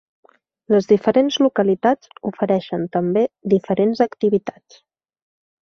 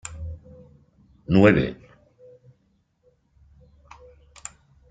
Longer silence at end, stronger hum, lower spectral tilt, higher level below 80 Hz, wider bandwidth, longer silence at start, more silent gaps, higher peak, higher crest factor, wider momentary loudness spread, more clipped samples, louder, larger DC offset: second, 1.1 s vs 3.2 s; neither; about the same, -6.5 dB/octave vs -7 dB/octave; second, -62 dBFS vs -48 dBFS; second, 6.6 kHz vs 9.4 kHz; first, 0.7 s vs 0.05 s; neither; about the same, -2 dBFS vs -2 dBFS; second, 18 dB vs 26 dB; second, 7 LU vs 27 LU; neither; about the same, -19 LUFS vs -20 LUFS; neither